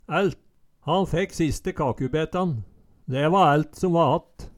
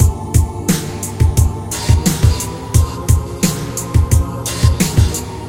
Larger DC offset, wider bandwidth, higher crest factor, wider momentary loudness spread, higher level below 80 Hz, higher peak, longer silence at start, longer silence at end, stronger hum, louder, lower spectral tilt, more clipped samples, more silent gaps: second, under 0.1% vs 0.4%; second, 13.5 kHz vs 16.5 kHz; about the same, 16 dB vs 14 dB; first, 10 LU vs 5 LU; second, -44 dBFS vs -20 dBFS; second, -8 dBFS vs 0 dBFS; about the same, 0.1 s vs 0 s; about the same, 0.05 s vs 0 s; neither; second, -24 LUFS vs -16 LUFS; first, -6.5 dB/octave vs -5 dB/octave; neither; neither